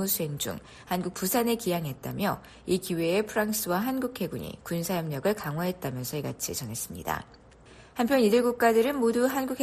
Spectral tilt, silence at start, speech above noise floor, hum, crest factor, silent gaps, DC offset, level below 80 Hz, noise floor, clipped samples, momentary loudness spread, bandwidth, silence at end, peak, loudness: -4.5 dB/octave; 0 s; 24 dB; none; 18 dB; none; under 0.1%; -58 dBFS; -52 dBFS; under 0.1%; 11 LU; 14.5 kHz; 0 s; -10 dBFS; -28 LUFS